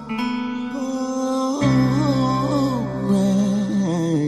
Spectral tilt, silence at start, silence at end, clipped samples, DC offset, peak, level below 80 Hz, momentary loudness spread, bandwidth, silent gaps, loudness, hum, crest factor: -7 dB/octave; 0 s; 0 s; under 0.1%; 0.2%; -8 dBFS; -48 dBFS; 7 LU; 13 kHz; none; -21 LUFS; none; 12 dB